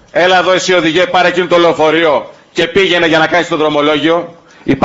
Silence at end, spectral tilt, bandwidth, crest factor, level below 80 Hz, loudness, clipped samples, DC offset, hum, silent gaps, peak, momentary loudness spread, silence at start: 0 s; -4 dB/octave; 8 kHz; 10 dB; -46 dBFS; -10 LUFS; under 0.1%; under 0.1%; none; none; 0 dBFS; 8 LU; 0.15 s